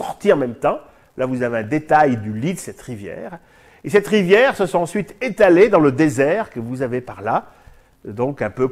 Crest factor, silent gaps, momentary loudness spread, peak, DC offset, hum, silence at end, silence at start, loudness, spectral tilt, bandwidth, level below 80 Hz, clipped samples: 18 dB; none; 18 LU; -2 dBFS; under 0.1%; none; 0 s; 0 s; -18 LUFS; -6 dB/octave; 14.5 kHz; -52 dBFS; under 0.1%